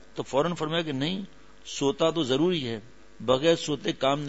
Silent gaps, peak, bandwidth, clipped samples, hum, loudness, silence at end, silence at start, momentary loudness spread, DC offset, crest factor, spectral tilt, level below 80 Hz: none; -8 dBFS; 8 kHz; under 0.1%; none; -27 LUFS; 0 s; 0.15 s; 12 LU; 0.4%; 18 dB; -5 dB/octave; -58 dBFS